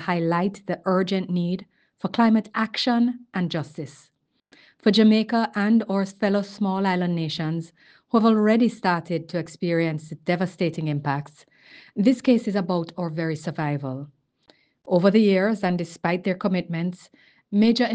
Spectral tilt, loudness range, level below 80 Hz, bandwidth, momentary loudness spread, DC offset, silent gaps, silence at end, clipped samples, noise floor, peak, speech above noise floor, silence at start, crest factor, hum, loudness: -7 dB/octave; 3 LU; -68 dBFS; 9 kHz; 12 LU; under 0.1%; none; 0 s; under 0.1%; -60 dBFS; -6 dBFS; 38 dB; 0 s; 18 dB; none; -23 LUFS